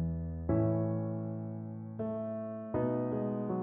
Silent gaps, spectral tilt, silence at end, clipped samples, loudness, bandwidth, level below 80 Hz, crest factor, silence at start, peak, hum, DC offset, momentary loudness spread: none; -11.5 dB/octave; 0 s; under 0.1%; -35 LUFS; 3.2 kHz; -52 dBFS; 16 dB; 0 s; -18 dBFS; none; under 0.1%; 9 LU